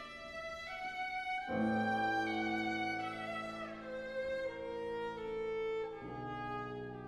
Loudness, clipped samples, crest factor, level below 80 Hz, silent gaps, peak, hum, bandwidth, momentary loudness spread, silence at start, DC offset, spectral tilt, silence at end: -39 LUFS; under 0.1%; 14 dB; -64 dBFS; none; -24 dBFS; none; 12.5 kHz; 10 LU; 0 s; under 0.1%; -5.5 dB/octave; 0 s